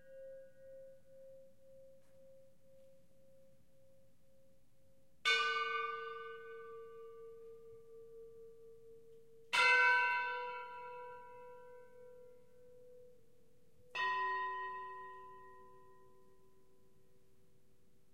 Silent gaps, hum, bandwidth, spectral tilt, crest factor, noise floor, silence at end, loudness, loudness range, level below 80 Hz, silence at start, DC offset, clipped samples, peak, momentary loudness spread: none; none; 15.5 kHz; -0.5 dB/octave; 24 dB; -73 dBFS; 2.35 s; -35 LUFS; 20 LU; -84 dBFS; 0.05 s; under 0.1%; under 0.1%; -18 dBFS; 28 LU